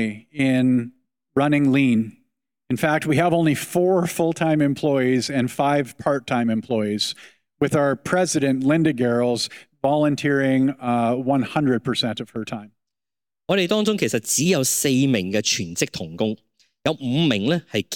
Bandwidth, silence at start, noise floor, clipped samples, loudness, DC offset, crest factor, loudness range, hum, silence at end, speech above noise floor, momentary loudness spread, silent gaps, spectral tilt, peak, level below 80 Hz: 17.5 kHz; 0 s; under -90 dBFS; under 0.1%; -21 LUFS; under 0.1%; 16 dB; 2 LU; none; 0 s; over 70 dB; 8 LU; none; -5 dB/octave; -6 dBFS; -60 dBFS